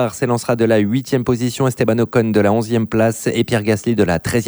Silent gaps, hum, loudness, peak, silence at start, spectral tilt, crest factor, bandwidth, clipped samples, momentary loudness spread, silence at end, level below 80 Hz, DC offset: none; none; -17 LUFS; -2 dBFS; 0 s; -6 dB/octave; 14 dB; over 20 kHz; under 0.1%; 3 LU; 0 s; -46 dBFS; under 0.1%